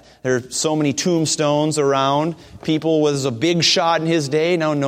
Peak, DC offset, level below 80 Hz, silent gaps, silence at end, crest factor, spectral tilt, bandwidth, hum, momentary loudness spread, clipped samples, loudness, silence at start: -2 dBFS; under 0.1%; -58 dBFS; none; 0 s; 16 dB; -4 dB/octave; 15.5 kHz; none; 7 LU; under 0.1%; -18 LUFS; 0.25 s